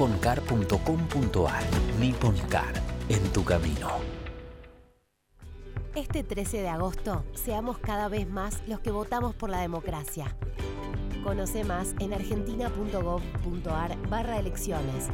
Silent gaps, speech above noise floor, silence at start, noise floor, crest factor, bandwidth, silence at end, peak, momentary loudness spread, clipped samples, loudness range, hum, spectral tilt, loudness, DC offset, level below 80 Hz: none; 37 dB; 0 s; -66 dBFS; 18 dB; 16.5 kHz; 0 s; -10 dBFS; 10 LU; under 0.1%; 7 LU; none; -6 dB/octave; -30 LUFS; under 0.1%; -36 dBFS